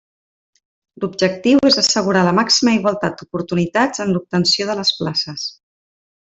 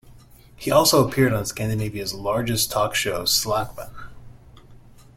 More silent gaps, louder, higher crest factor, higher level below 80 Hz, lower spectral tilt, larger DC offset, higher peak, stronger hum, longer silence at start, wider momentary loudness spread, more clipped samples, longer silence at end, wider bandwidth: neither; first, -16 LUFS vs -21 LUFS; about the same, 16 dB vs 20 dB; second, -56 dBFS vs -46 dBFS; about the same, -4 dB/octave vs -3.5 dB/octave; neither; about the same, -2 dBFS vs -4 dBFS; neither; first, 1 s vs 0.1 s; about the same, 12 LU vs 13 LU; neither; first, 0.75 s vs 0.4 s; second, 8.2 kHz vs 16.5 kHz